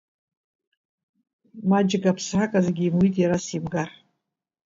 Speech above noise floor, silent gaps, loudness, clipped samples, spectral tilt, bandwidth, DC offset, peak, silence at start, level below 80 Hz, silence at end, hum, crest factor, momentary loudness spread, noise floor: 59 dB; none; -23 LUFS; under 0.1%; -6.5 dB/octave; 7.6 kHz; under 0.1%; -8 dBFS; 1.55 s; -58 dBFS; 0.9 s; none; 18 dB; 9 LU; -81 dBFS